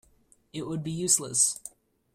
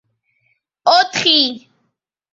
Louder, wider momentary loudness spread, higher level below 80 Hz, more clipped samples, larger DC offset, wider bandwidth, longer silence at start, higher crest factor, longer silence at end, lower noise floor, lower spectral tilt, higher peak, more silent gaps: second, -25 LUFS vs -13 LUFS; first, 18 LU vs 8 LU; about the same, -66 dBFS vs -66 dBFS; neither; neither; first, 16 kHz vs 7.8 kHz; second, 0.55 s vs 0.85 s; about the same, 22 dB vs 18 dB; second, 0.45 s vs 0.75 s; second, -63 dBFS vs -71 dBFS; about the same, -3 dB/octave vs -2 dB/octave; second, -8 dBFS vs -2 dBFS; neither